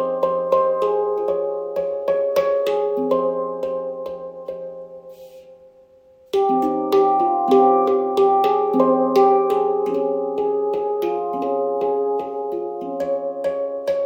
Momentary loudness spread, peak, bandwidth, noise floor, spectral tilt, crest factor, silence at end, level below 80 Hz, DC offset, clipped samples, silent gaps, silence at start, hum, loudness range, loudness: 11 LU; -4 dBFS; 17 kHz; -51 dBFS; -6.5 dB/octave; 16 dB; 0 s; -62 dBFS; under 0.1%; under 0.1%; none; 0 s; none; 9 LU; -20 LUFS